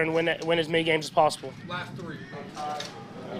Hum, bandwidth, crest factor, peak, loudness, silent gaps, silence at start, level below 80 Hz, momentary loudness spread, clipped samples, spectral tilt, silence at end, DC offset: none; 15.5 kHz; 20 dB; -8 dBFS; -27 LUFS; none; 0 s; -66 dBFS; 14 LU; under 0.1%; -4.5 dB/octave; 0 s; under 0.1%